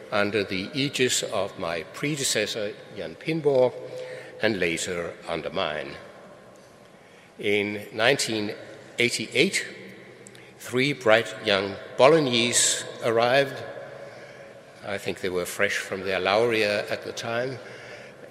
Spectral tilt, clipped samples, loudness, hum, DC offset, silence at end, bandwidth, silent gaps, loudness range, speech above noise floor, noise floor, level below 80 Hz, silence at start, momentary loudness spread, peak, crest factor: -3 dB/octave; under 0.1%; -24 LUFS; none; under 0.1%; 0 s; 16 kHz; none; 7 LU; 26 dB; -51 dBFS; -68 dBFS; 0 s; 20 LU; -2 dBFS; 26 dB